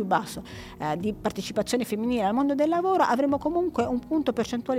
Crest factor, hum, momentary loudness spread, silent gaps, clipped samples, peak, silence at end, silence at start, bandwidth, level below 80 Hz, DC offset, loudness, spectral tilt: 16 dB; none; 8 LU; none; under 0.1%; -10 dBFS; 0 s; 0 s; 16.5 kHz; -54 dBFS; under 0.1%; -26 LUFS; -5.5 dB/octave